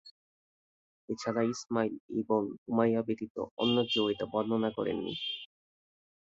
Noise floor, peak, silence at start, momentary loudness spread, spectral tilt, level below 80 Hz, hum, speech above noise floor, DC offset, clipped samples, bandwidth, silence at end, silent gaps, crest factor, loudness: under -90 dBFS; -14 dBFS; 0.05 s; 9 LU; -5.5 dB/octave; -70 dBFS; none; over 58 dB; under 0.1%; under 0.1%; 7.8 kHz; 0.75 s; 0.11-1.08 s, 2.00-2.09 s, 2.58-2.66 s, 3.30-3.35 s, 3.51-3.57 s; 18 dB; -32 LUFS